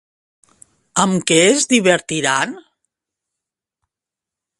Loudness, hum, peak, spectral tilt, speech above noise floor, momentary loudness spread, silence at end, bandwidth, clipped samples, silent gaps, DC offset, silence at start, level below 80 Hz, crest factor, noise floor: -15 LUFS; none; 0 dBFS; -3 dB/octave; 71 dB; 8 LU; 2 s; 11.5 kHz; under 0.1%; none; under 0.1%; 0.95 s; -62 dBFS; 20 dB; -87 dBFS